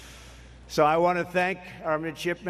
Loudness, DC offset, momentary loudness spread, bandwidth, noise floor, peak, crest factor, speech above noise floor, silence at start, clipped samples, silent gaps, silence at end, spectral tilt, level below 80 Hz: -26 LUFS; under 0.1%; 14 LU; 14.5 kHz; -47 dBFS; -8 dBFS; 20 dB; 22 dB; 0 s; under 0.1%; none; 0 s; -5.5 dB/octave; -52 dBFS